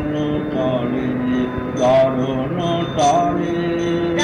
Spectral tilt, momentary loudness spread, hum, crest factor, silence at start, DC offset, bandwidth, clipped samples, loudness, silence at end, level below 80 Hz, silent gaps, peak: -6 dB/octave; 6 LU; none; 12 dB; 0 s; under 0.1%; 10.5 kHz; under 0.1%; -19 LUFS; 0 s; -42 dBFS; none; -6 dBFS